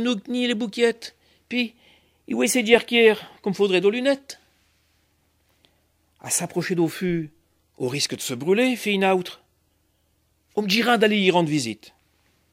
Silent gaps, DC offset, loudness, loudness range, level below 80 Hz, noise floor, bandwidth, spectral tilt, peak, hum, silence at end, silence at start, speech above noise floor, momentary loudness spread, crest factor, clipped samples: none; under 0.1%; -22 LUFS; 7 LU; -64 dBFS; -67 dBFS; 16 kHz; -4 dB/octave; -2 dBFS; none; 0.8 s; 0 s; 45 dB; 13 LU; 22 dB; under 0.1%